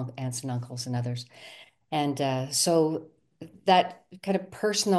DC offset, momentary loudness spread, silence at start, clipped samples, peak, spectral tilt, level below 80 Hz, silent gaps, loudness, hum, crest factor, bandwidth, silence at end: under 0.1%; 15 LU; 0 s; under 0.1%; -8 dBFS; -4 dB/octave; -72 dBFS; none; -28 LUFS; none; 20 dB; 12.5 kHz; 0 s